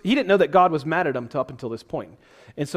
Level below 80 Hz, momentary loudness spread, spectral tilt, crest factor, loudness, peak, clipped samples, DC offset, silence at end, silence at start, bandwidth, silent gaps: -58 dBFS; 16 LU; -6 dB/octave; 18 dB; -22 LUFS; -4 dBFS; under 0.1%; under 0.1%; 0 s; 0.05 s; 14.5 kHz; none